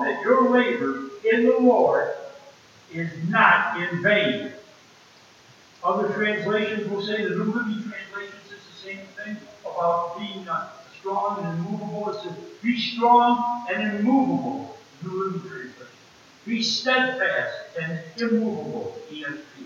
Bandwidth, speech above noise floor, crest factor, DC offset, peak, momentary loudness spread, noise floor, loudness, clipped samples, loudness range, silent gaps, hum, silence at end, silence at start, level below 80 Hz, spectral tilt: 7.4 kHz; 29 dB; 22 dB; under 0.1%; -2 dBFS; 19 LU; -52 dBFS; -23 LUFS; under 0.1%; 8 LU; none; none; 0 s; 0 s; -76 dBFS; -5.5 dB/octave